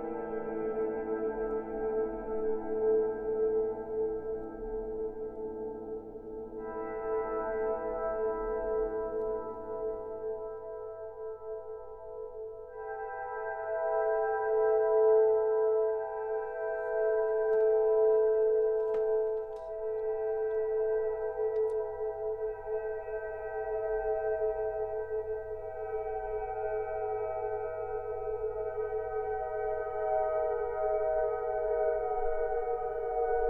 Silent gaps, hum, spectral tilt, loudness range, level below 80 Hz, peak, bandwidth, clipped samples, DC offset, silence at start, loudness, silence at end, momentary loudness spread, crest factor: none; none; -9 dB/octave; 9 LU; -54 dBFS; -16 dBFS; 2.8 kHz; under 0.1%; under 0.1%; 0 s; -33 LUFS; 0 s; 12 LU; 16 dB